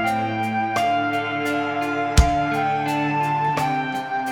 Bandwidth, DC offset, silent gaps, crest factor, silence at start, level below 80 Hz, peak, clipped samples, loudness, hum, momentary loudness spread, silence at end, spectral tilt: over 20 kHz; 0.1%; none; 20 dB; 0 s; -30 dBFS; 0 dBFS; under 0.1%; -22 LUFS; none; 5 LU; 0 s; -5.5 dB/octave